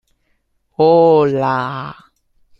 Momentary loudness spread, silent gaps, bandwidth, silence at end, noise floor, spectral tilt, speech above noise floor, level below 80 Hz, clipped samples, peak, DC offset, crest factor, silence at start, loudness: 20 LU; none; 5.8 kHz; 0.7 s; -64 dBFS; -8.5 dB/octave; 51 dB; -56 dBFS; under 0.1%; -2 dBFS; under 0.1%; 14 dB; 0.8 s; -14 LUFS